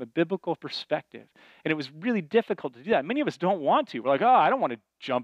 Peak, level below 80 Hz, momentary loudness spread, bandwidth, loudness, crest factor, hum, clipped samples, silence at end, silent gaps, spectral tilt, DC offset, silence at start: -10 dBFS; -76 dBFS; 12 LU; 9.2 kHz; -26 LUFS; 16 dB; none; under 0.1%; 0 s; none; -6.5 dB/octave; under 0.1%; 0 s